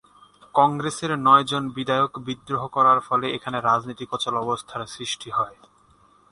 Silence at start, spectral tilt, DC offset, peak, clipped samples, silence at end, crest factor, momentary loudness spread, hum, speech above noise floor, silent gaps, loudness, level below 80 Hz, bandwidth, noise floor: 0.55 s; -4.5 dB/octave; under 0.1%; -2 dBFS; under 0.1%; 0.8 s; 20 dB; 12 LU; none; 35 dB; none; -22 LUFS; -62 dBFS; 11.5 kHz; -57 dBFS